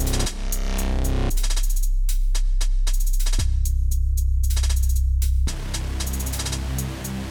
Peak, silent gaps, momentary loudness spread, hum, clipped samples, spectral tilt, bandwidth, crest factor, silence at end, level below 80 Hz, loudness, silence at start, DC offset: -10 dBFS; none; 5 LU; none; under 0.1%; -4 dB/octave; 19 kHz; 12 dB; 0 s; -20 dBFS; -25 LUFS; 0 s; under 0.1%